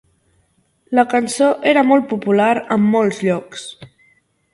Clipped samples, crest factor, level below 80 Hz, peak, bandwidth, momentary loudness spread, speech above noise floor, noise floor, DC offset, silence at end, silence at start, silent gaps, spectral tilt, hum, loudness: under 0.1%; 16 dB; -62 dBFS; 0 dBFS; 11.5 kHz; 10 LU; 46 dB; -61 dBFS; under 0.1%; 0.65 s; 0.9 s; none; -5.5 dB/octave; none; -16 LUFS